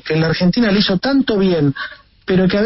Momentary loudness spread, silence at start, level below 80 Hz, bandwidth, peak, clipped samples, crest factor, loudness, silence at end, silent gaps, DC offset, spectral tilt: 12 LU; 0.05 s; -42 dBFS; 6 kHz; -4 dBFS; under 0.1%; 12 dB; -15 LUFS; 0 s; none; under 0.1%; -9 dB/octave